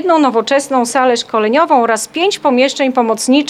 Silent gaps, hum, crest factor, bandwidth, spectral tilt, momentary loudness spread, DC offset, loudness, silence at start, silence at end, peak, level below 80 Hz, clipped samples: none; none; 12 dB; 14.5 kHz; -2.5 dB/octave; 3 LU; under 0.1%; -13 LUFS; 0 s; 0 s; 0 dBFS; -68 dBFS; under 0.1%